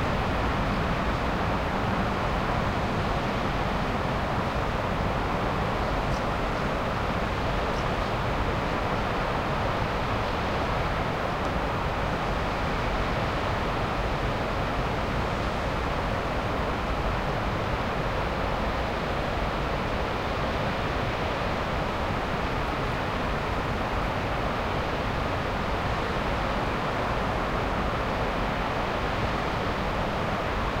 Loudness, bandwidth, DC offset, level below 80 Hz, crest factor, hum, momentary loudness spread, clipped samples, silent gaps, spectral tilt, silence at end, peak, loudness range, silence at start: -28 LUFS; 16 kHz; under 0.1%; -34 dBFS; 14 dB; none; 1 LU; under 0.1%; none; -6 dB/octave; 0 s; -14 dBFS; 1 LU; 0 s